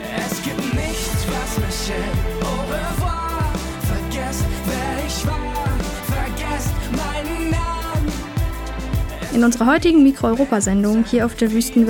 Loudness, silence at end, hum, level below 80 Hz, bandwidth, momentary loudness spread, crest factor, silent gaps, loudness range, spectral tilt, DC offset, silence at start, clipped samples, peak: -20 LUFS; 0 s; none; -28 dBFS; 19 kHz; 9 LU; 14 dB; none; 6 LU; -5.5 dB/octave; under 0.1%; 0 s; under 0.1%; -4 dBFS